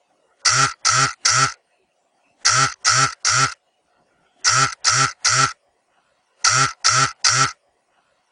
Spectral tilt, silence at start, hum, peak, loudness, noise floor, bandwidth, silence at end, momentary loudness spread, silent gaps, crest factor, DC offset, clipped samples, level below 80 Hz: -0.5 dB/octave; 0.45 s; none; 0 dBFS; -17 LUFS; -66 dBFS; 10.5 kHz; 0.8 s; 4 LU; none; 20 dB; under 0.1%; under 0.1%; -56 dBFS